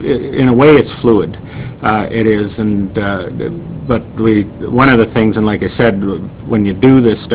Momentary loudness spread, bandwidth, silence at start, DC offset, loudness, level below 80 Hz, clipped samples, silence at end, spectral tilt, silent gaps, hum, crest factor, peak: 13 LU; 4 kHz; 0 s; under 0.1%; -12 LUFS; -34 dBFS; 0.3%; 0 s; -11.5 dB/octave; none; none; 12 dB; 0 dBFS